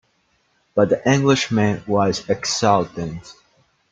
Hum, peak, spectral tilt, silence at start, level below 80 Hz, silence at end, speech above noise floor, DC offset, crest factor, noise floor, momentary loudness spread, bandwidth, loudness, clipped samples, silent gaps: none; -2 dBFS; -5 dB/octave; 0.75 s; -54 dBFS; 0.6 s; 46 dB; under 0.1%; 18 dB; -64 dBFS; 11 LU; 9.4 kHz; -19 LUFS; under 0.1%; none